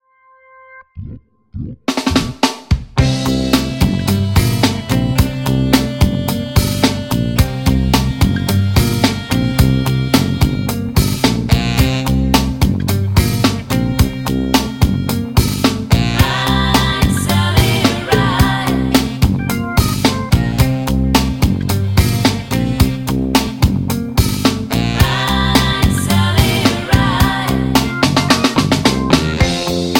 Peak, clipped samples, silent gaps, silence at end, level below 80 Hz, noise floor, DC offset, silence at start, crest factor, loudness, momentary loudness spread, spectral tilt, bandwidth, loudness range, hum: 0 dBFS; under 0.1%; none; 0 s; -24 dBFS; -49 dBFS; under 0.1%; 0.7 s; 14 dB; -15 LUFS; 4 LU; -5 dB/octave; 17 kHz; 2 LU; none